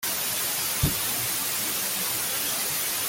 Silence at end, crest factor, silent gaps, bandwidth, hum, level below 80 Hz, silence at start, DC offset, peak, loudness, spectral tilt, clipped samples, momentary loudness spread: 0 s; 18 dB; none; 17 kHz; none; -46 dBFS; 0 s; under 0.1%; -10 dBFS; -25 LUFS; -1.5 dB/octave; under 0.1%; 1 LU